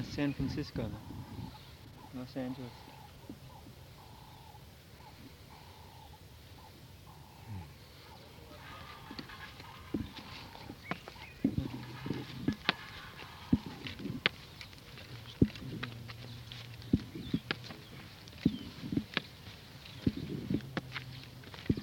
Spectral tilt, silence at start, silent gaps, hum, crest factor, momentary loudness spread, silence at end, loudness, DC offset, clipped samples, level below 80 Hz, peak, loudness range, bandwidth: -6 dB/octave; 0 s; none; none; 34 dB; 18 LU; 0 s; -40 LUFS; under 0.1%; under 0.1%; -56 dBFS; -6 dBFS; 15 LU; 18 kHz